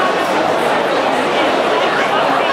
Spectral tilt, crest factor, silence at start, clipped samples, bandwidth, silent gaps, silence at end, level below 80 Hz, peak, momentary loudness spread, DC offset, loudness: -3.5 dB/octave; 12 dB; 0 s; under 0.1%; 16 kHz; none; 0 s; -56 dBFS; -2 dBFS; 1 LU; under 0.1%; -14 LUFS